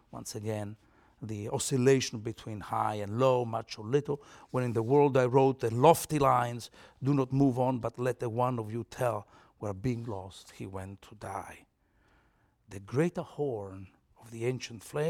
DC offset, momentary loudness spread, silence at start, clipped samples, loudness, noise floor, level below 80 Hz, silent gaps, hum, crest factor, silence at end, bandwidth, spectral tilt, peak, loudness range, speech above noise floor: under 0.1%; 18 LU; 0.15 s; under 0.1%; -30 LUFS; -69 dBFS; -62 dBFS; none; none; 24 dB; 0 s; 17.5 kHz; -6 dB/octave; -8 dBFS; 12 LU; 39 dB